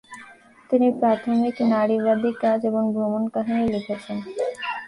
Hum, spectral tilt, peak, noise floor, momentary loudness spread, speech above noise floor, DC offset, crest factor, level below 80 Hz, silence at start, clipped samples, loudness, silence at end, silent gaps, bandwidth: none; -7 dB/octave; -8 dBFS; -48 dBFS; 10 LU; 26 dB; under 0.1%; 14 dB; -58 dBFS; 0.1 s; under 0.1%; -22 LUFS; 0 s; none; 11 kHz